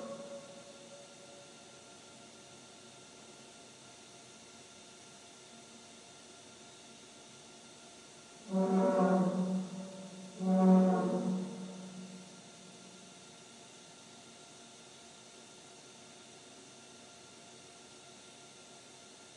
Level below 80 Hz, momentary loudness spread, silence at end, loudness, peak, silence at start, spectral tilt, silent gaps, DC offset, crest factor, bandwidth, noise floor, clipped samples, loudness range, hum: -86 dBFS; 23 LU; 0.1 s; -33 LUFS; -14 dBFS; 0 s; -6.5 dB/octave; none; under 0.1%; 24 dB; 11 kHz; -55 dBFS; under 0.1%; 21 LU; none